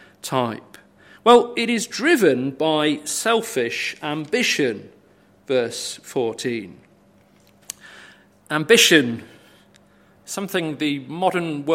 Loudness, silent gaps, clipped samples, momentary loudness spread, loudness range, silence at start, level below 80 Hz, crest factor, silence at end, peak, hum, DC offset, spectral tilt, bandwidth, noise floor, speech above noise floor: -20 LUFS; none; under 0.1%; 16 LU; 9 LU; 0.25 s; -68 dBFS; 22 dB; 0 s; 0 dBFS; 50 Hz at -55 dBFS; under 0.1%; -3 dB/octave; 16.5 kHz; -55 dBFS; 35 dB